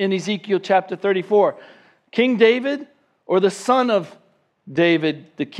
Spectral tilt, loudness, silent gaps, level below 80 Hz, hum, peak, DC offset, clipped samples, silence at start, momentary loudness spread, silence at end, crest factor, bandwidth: -5.5 dB/octave; -19 LUFS; none; -76 dBFS; none; -2 dBFS; under 0.1%; under 0.1%; 0 s; 11 LU; 0 s; 18 dB; 11.5 kHz